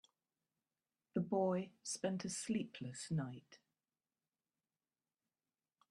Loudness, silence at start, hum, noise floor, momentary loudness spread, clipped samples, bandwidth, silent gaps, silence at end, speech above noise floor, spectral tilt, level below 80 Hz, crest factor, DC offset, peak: -42 LUFS; 1.15 s; none; under -90 dBFS; 11 LU; under 0.1%; 12.5 kHz; none; 2.35 s; over 49 dB; -5.5 dB/octave; -82 dBFS; 20 dB; under 0.1%; -26 dBFS